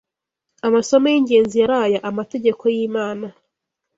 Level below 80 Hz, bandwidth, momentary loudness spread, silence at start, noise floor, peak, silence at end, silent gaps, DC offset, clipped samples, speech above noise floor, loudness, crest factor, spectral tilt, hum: -60 dBFS; 7.8 kHz; 10 LU; 0.65 s; -80 dBFS; -2 dBFS; 0.65 s; none; under 0.1%; under 0.1%; 63 dB; -18 LUFS; 16 dB; -5 dB/octave; none